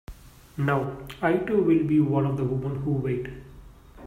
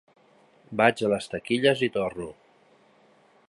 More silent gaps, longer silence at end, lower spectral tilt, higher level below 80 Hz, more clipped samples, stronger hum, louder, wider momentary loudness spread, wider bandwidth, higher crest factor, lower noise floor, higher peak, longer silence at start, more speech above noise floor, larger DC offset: neither; second, 0 s vs 1.15 s; first, -9 dB/octave vs -5 dB/octave; first, -48 dBFS vs -62 dBFS; neither; neither; about the same, -25 LUFS vs -25 LUFS; about the same, 12 LU vs 14 LU; first, 14.5 kHz vs 11.5 kHz; second, 16 dB vs 24 dB; second, -47 dBFS vs -60 dBFS; second, -10 dBFS vs -4 dBFS; second, 0.1 s vs 0.7 s; second, 23 dB vs 35 dB; neither